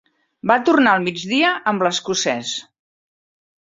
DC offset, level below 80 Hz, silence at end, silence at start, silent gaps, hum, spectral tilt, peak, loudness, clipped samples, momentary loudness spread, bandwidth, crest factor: under 0.1%; -64 dBFS; 1 s; 0.45 s; none; none; -3.5 dB/octave; -2 dBFS; -18 LUFS; under 0.1%; 11 LU; 7.8 kHz; 18 dB